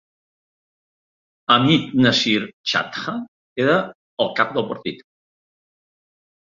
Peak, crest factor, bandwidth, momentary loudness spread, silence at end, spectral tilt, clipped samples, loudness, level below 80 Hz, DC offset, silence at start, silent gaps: 0 dBFS; 22 dB; 7.6 kHz; 16 LU; 1.5 s; -5 dB/octave; under 0.1%; -19 LUFS; -60 dBFS; under 0.1%; 1.5 s; 2.53-2.64 s, 3.28-3.56 s, 3.95-4.17 s